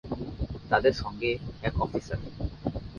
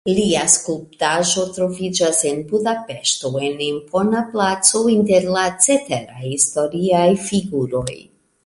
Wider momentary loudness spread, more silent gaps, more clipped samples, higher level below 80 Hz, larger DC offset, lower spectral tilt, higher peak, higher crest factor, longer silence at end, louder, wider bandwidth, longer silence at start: first, 13 LU vs 8 LU; neither; neither; first, -42 dBFS vs -52 dBFS; neither; first, -6.5 dB/octave vs -3 dB/octave; second, -6 dBFS vs 0 dBFS; first, 24 dB vs 18 dB; second, 0 s vs 0.45 s; second, -30 LUFS vs -17 LUFS; second, 7.2 kHz vs 11.5 kHz; about the same, 0.05 s vs 0.05 s